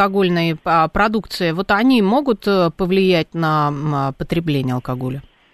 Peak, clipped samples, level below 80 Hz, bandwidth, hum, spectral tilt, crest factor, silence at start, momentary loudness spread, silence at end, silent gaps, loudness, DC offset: -2 dBFS; under 0.1%; -42 dBFS; 13.5 kHz; none; -7 dB/octave; 14 dB; 0 s; 8 LU; 0.3 s; none; -17 LUFS; under 0.1%